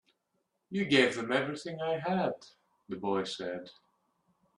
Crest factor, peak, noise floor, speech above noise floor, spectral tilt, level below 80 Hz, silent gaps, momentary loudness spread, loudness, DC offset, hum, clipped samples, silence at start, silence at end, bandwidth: 24 dB; -10 dBFS; -80 dBFS; 48 dB; -5 dB/octave; -74 dBFS; none; 14 LU; -32 LUFS; under 0.1%; none; under 0.1%; 0.7 s; 0.85 s; 11.5 kHz